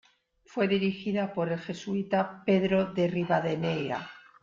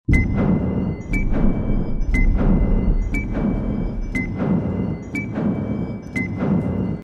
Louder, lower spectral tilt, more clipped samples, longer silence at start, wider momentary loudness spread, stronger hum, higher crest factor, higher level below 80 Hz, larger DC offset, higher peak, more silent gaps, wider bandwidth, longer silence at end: second, -29 LUFS vs -22 LUFS; second, -7 dB/octave vs -9 dB/octave; neither; first, 0.5 s vs 0.1 s; about the same, 8 LU vs 6 LU; neither; about the same, 16 dB vs 16 dB; second, -64 dBFS vs -24 dBFS; neither; second, -14 dBFS vs -4 dBFS; neither; about the same, 7.4 kHz vs 8 kHz; first, 0.2 s vs 0 s